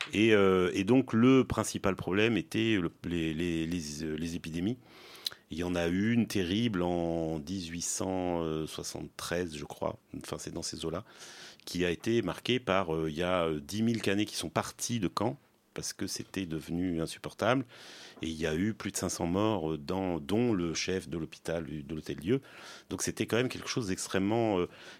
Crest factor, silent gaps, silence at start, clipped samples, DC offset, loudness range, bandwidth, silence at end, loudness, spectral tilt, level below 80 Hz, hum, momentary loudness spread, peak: 22 dB; none; 0 s; under 0.1%; under 0.1%; 6 LU; 16.5 kHz; 0 s; -32 LUFS; -5 dB/octave; -58 dBFS; none; 12 LU; -10 dBFS